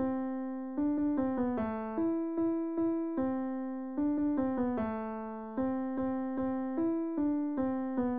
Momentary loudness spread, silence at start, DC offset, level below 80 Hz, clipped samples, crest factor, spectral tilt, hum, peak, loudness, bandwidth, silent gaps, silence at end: 6 LU; 0 s; 0.2%; -62 dBFS; under 0.1%; 10 dB; -8 dB/octave; none; -22 dBFS; -33 LUFS; 3.6 kHz; none; 0 s